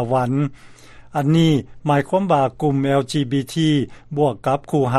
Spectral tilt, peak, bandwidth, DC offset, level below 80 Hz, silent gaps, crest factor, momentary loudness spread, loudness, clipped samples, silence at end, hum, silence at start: -7 dB/octave; -2 dBFS; 13 kHz; under 0.1%; -50 dBFS; none; 16 dB; 6 LU; -19 LUFS; under 0.1%; 0 s; none; 0 s